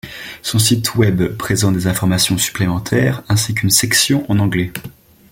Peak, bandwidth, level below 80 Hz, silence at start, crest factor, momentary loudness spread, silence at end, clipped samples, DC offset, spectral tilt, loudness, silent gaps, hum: 0 dBFS; 17 kHz; -42 dBFS; 0.05 s; 16 dB; 7 LU; 0.4 s; under 0.1%; under 0.1%; -4 dB/octave; -15 LUFS; none; none